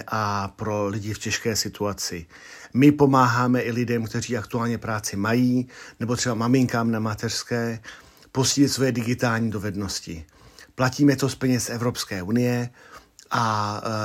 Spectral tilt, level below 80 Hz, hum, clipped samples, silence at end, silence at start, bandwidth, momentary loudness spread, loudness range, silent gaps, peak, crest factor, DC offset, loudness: -5 dB/octave; -56 dBFS; none; under 0.1%; 0 s; 0 s; 16 kHz; 11 LU; 3 LU; none; -4 dBFS; 20 dB; under 0.1%; -23 LUFS